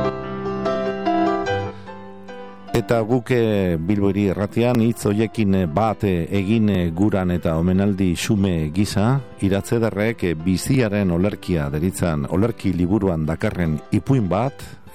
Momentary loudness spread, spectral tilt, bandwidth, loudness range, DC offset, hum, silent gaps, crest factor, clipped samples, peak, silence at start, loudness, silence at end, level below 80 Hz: 6 LU; -7 dB/octave; 16 kHz; 2 LU; 0.8%; none; none; 16 dB; under 0.1%; -4 dBFS; 0 s; -20 LUFS; 0.05 s; -40 dBFS